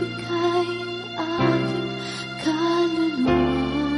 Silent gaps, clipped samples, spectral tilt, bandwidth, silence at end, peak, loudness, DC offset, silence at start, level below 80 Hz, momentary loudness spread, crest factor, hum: none; under 0.1%; -6 dB/octave; 11.5 kHz; 0 s; -8 dBFS; -23 LUFS; under 0.1%; 0 s; -44 dBFS; 8 LU; 16 dB; none